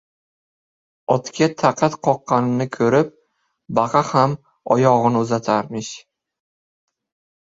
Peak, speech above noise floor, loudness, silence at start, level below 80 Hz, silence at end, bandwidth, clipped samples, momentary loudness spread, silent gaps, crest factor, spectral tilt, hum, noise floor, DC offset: -2 dBFS; 49 dB; -19 LUFS; 1.1 s; -60 dBFS; 1.45 s; 7.8 kHz; under 0.1%; 13 LU; none; 20 dB; -6 dB/octave; none; -67 dBFS; under 0.1%